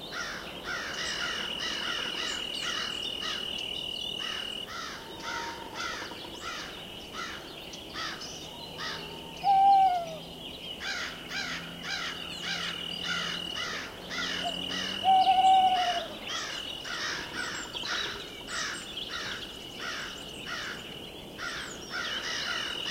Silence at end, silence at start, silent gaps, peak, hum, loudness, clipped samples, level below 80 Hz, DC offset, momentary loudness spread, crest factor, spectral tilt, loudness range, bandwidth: 0 s; 0 s; none; -14 dBFS; none; -31 LUFS; under 0.1%; -58 dBFS; under 0.1%; 15 LU; 18 dB; -1.5 dB/octave; 10 LU; 16 kHz